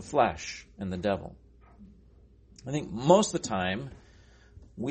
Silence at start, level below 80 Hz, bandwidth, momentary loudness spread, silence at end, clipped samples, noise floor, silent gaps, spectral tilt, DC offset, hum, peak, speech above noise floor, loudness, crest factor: 0 s; -54 dBFS; 8.4 kHz; 22 LU; 0 s; under 0.1%; -57 dBFS; none; -5 dB/octave; under 0.1%; none; -6 dBFS; 29 dB; -29 LUFS; 24 dB